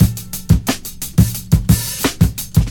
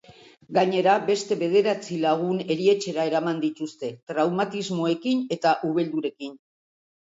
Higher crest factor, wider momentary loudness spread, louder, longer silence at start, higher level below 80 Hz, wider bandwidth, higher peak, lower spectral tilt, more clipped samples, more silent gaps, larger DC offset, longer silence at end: about the same, 16 dB vs 18 dB; about the same, 7 LU vs 9 LU; first, -17 LUFS vs -24 LUFS; second, 0 s vs 0.5 s; first, -24 dBFS vs -72 dBFS; first, 18 kHz vs 8 kHz; first, 0 dBFS vs -6 dBFS; about the same, -5.5 dB/octave vs -5.5 dB/octave; neither; second, none vs 4.03-4.07 s; neither; second, 0 s vs 0.65 s